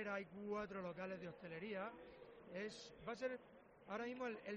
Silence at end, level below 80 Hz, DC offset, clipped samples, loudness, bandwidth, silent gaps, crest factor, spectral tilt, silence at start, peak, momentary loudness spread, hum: 0 s; -78 dBFS; under 0.1%; under 0.1%; -50 LUFS; 7.6 kHz; none; 18 dB; -4 dB/octave; 0 s; -32 dBFS; 12 LU; none